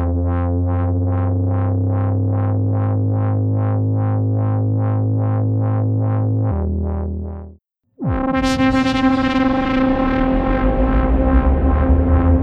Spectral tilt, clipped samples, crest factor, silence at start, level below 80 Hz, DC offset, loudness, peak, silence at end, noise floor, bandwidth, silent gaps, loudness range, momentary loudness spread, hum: -8.5 dB/octave; under 0.1%; 16 dB; 0 s; -24 dBFS; under 0.1%; -18 LUFS; 0 dBFS; 0 s; -48 dBFS; 7.8 kHz; none; 3 LU; 5 LU; none